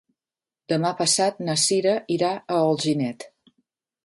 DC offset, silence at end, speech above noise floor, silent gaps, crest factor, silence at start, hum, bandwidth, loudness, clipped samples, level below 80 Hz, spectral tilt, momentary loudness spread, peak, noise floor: under 0.1%; 0.8 s; over 68 dB; none; 16 dB; 0.7 s; none; 11.5 kHz; -22 LUFS; under 0.1%; -70 dBFS; -3.5 dB/octave; 7 LU; -8 dBFS; under -90 dBFS